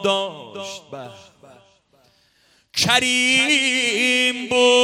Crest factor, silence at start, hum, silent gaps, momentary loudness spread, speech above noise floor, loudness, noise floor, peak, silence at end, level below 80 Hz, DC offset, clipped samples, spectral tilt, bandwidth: 20 dB; 0 s; none; none; 19 LU; 40 dB; -17 LUFS; -59 dBFS; -2 dBFS; 0 s; -62 dBFS; under 0.1%; under 0.1%; -1.5 dB/octave; 16.5 kHz